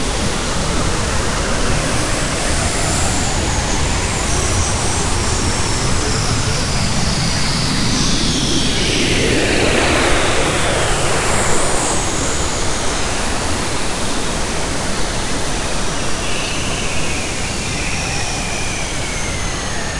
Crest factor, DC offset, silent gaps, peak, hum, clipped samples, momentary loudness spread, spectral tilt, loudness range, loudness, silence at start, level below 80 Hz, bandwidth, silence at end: 16 dB; under 0.1%; none; 0 dBFS; none; under 0.1%; 5 LU; -3 dB/octave; 5 LU; -17 LUFS; 0 s; -24 dBFS; 11.5 kHz; 0 s